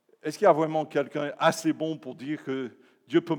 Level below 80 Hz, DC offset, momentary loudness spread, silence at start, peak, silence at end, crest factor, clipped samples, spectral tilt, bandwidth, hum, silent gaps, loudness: under -90 dBFS; under 0.1%; 13 LU; 0.25 s; -8 dBFS; 0 s; 20 dB; under 0.1%; -5.5 dB/octave; 19 kHz; none; none; -27 LUFS